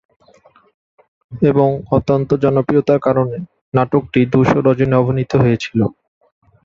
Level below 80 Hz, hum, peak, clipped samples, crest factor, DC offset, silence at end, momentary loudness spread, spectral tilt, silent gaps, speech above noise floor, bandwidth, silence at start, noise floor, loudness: -44 dBFS; none; 0 dBFS; under 0.1%; 16 dB; under 0.1%; 0.75 s; 6 LU; -8.5 dB/octave; 3.61-3.72 s; 36 dB; 7.4 kHz; 1.3 s; -50 dBFS; -15 LUFS